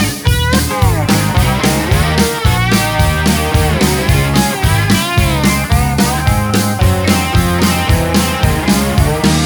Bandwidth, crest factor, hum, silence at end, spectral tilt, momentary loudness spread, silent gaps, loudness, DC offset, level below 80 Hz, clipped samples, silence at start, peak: over 20 kHz; 12 dB; none; 0 s; -5 dB/octave; 1 LU; none; -12 LUFS; under 0.1%; -20 dBFS; under 0.1%; 0 s; 0 dBFS